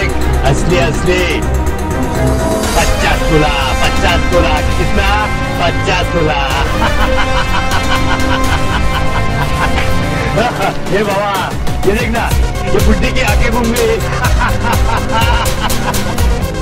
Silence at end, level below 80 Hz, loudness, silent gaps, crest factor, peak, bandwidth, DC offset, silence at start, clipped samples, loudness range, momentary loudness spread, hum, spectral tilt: 0 s; -18 dBFS; -13 LUFS; none; 12 dB; 0 dBFS; 16.5 kHz; under 0.1%; 0 s; under 0.1%; 2 LU; 3 LU; none; -5 dB/octave